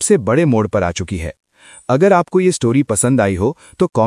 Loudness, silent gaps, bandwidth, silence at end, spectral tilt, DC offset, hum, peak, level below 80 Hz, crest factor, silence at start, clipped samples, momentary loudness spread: -15 LUFS; none; 11.5 kHz; 0 s; -5.5 dB/octave; under 0.1%; none; 0 dBFS; -44 dBFS; 14 dB; 0 s; under 0.1%; 11 LU